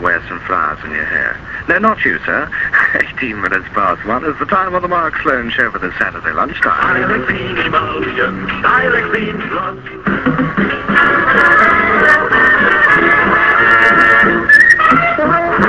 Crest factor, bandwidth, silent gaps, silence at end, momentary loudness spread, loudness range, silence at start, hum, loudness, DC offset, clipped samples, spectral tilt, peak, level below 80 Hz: 12 dB; 11 kHz; none; 0 s; 10 LU; 7 LU; 0 s; none; -11 LUFS; 0.3%; 0.2%; -5.5 dB/octave; 0 dBFS; -38 dBFS